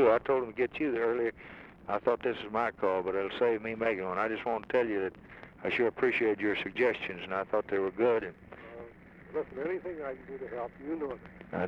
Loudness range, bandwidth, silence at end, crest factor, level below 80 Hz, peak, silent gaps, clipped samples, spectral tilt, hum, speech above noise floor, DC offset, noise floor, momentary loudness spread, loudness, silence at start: 5 LU; 6.4 kHz; 0 s; 18 dB; -62 dBFS; -14 dBFS; none; under 0.1%; -7 dB/octave; none; 20 dB; under 0.1%; -52 dBFS; 17 LU; -32 LUFS; 0 s